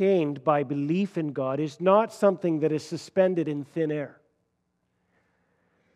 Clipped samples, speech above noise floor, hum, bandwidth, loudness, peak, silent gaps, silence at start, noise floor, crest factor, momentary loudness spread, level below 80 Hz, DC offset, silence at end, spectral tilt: under 0.1%; 50 dB; 60 Hz at -60 dBFS; 12.5 kHz; -26 LUFS; -8 dBFS; none; 0 s; -75 dBFS; 18 dB; 8 LU; -78 dBFS; under 0.1%; 1.85 s; -7.5 dB/octave